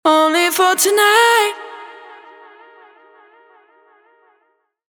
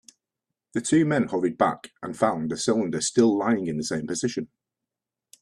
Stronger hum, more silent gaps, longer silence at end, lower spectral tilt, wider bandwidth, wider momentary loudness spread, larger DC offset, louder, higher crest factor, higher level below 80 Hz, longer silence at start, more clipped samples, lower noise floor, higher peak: neither; neither; first, 3 s vs 0.95 s; second, 0.5 dB/octave vs -5 dB/octave; first, over 20 kHz vs 12.5 kHz; first, 23 LU vs 12 LU; neither; first, -13 LUFS vs -24 LUFS; about the same, 18 dB vs 20 dB; second, -80 dBFS vs -64 dBFS; second, 0.05 s vs 0.75 s; neither; second, -64 dBFS vs -87 dBFS; first, 0 dBFS vs -6 dBFS